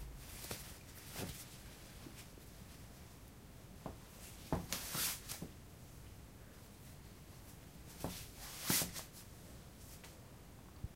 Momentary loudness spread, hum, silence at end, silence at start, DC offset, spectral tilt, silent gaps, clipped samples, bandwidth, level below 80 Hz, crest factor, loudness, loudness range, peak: 19 LU; none; 0 s; 0 s; under 0.1%; -2.5 dB/octave; none; under 0.1%; 16 kHz; -60 dBFS; 28 dB; -45 LUFS; 9 LU; -20 dBFS